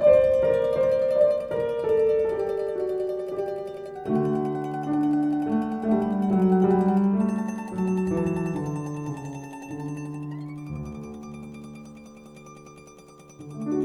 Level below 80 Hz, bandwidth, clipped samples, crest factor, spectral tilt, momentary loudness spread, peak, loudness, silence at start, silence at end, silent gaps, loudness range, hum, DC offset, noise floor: -54 dBFS; 11.5 kHz; under 0.1%; 18 dB; -8.5 dB/octave; 20 LU; -8 dBFS; -25 LUFS; 0 s; 0 s; none; 14 LU; none; under 0.1%; -49 dBFS